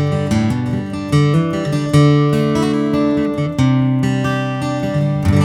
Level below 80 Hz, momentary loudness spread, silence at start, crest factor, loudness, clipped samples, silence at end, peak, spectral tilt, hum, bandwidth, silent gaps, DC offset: -38 dBFS; 6 LU; 0 s; 14 dB; -16 LUFS; under 0.1%; 0 s; 0 dBFS; -7.5 dB/octave; none; 12.5 kHz; none; under 0.1%